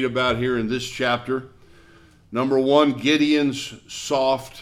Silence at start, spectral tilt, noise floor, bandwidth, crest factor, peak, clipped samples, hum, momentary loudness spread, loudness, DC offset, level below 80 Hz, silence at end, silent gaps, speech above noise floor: 0 s; -4.5 dB/octave; -51 dBFS; 14.5 kHz; 18 dB; -4 dBFS; under 0.1%; none; 12 LU; -21 LUFS; under 0.1%; -52 dBFS; 0 s; none; 30 dB